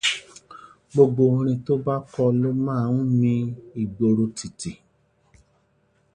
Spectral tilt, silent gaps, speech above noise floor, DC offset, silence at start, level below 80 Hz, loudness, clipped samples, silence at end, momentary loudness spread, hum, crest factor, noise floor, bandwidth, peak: -6.5 dB/octave; none; 43 dB; under 0.1%; 0.05 s; -58 dBFS; -22 LUFS; under 0.1%; 1.4 s; 13 LU; none; 20 dB; -65 dBFS; 10.5 kHz; -4 dBFS